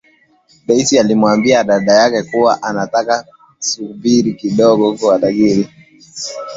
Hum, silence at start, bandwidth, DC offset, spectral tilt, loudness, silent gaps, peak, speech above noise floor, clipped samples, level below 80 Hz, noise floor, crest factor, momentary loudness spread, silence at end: none; 0.7 s; 8 kHz; under 0.1%; -4.5 dB/octave; -13 LUFS; none; 0 dBFS; 39 dB; under 0.1%; -54 dBFS; -52 dBFS; 14 dB; 12 LU; 0 s